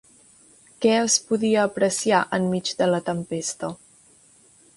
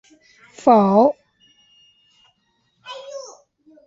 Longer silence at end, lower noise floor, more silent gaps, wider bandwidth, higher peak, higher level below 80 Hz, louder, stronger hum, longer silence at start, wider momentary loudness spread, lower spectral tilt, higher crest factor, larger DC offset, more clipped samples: first, 1 s vs 0.65 s; second, -55 dBFS vs -67 dBFS; neither; first, 11.5 kHz vs 7.8 kHz; second, -6 dBFS vs -2 dBFS; about the same, -64 dBFS vs -66 dBFS; second, -22 LUFS vs -16 LUFS; neither; first, 0.8 s vs 0.65 s; second, 9 LU vs 24 LU; second, -3.5 dB/octave vs -7 dB/octave; about the same, 18 dB vs 20 dB; neither; neither